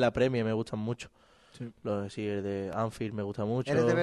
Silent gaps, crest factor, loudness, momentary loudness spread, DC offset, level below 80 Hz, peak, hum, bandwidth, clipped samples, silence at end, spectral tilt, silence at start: none; 16 dB; -32 LUFS; 13 LU; under 0.1%; -60 dBFS; -14 dBFS; none; 12 kHz; under 0.1%; 0 s; -7 dB/octave; 0 s